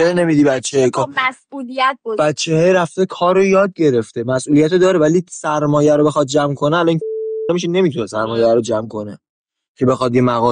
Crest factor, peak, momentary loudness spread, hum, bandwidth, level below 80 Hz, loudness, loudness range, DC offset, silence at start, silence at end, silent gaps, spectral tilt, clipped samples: 12 dB; -4 dBFS; 8 LU; none; 10 kHz; -54 dBFS; -15 LUFS; 3 LU; under 0.1%; 0 s; 0 s; 9.29-9.45 s, 9.68-9.75 s; -5.5 dB/octave; under 0.1%